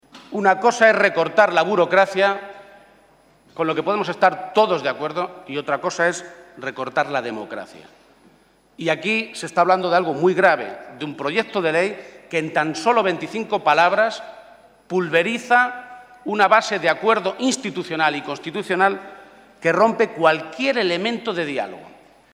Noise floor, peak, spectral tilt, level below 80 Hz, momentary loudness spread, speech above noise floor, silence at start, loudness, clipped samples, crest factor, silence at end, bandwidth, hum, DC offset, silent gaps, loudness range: -55 dBFS; 0 dBFS; -4 dB/octave; -68 dBFS; 15 LU; 35 dB; 0.15 s; -19 LUFS; under 0.1%; 20 dB; 0.45 s; 12.5 kHz; none; under 0.1%; none; 5 LU